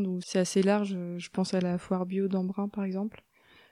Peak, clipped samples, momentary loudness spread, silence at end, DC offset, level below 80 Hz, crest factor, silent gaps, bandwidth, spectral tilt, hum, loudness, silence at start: -12 dBFS; under 0.1%; 9 LU; 0.65 s; under 0.1%; -70 dBFS; 18 dB; none; 11.5 kHz; -6 dB/octave; none; -30 LUFS; 0 s